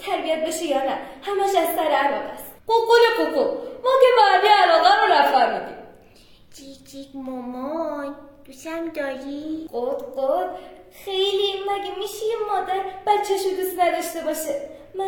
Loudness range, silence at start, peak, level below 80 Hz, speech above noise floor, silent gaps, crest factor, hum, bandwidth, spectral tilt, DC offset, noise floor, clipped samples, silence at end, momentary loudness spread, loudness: 14 LU; 0 s; -2 dBFS; -58 dBFS; 28 dB; none; 18 dB; none; 19 kHz; -2 dB/octave; under 0.1%; -50 dBFS; under 0.1%; 0 s; 18 LU; -21 LUFS